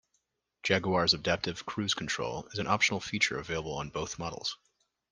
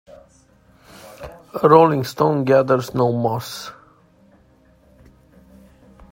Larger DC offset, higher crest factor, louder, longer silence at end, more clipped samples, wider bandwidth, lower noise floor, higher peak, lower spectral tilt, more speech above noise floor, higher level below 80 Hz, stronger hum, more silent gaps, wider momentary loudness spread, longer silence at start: neither; about the same, 24 dB vs 20 dB; second, -31 LUFS vs -17 LUFS; second, 0.55 s vs 2.4 s; neither; second, 10.5 kHz vs 16.5 kHz; first, -79 dBFS vs -54 dBFS; second, -8 dBFS vs 0 dBFS; second, -3.5 dB/octave vs -7 dB/octave; first, 47 dB vs 37 dB; about the same, -60 dBFS vs -56 dBFS; neither; neither; second, 10 LU vs 24 LU; second, 0.65 s vs 1.05 s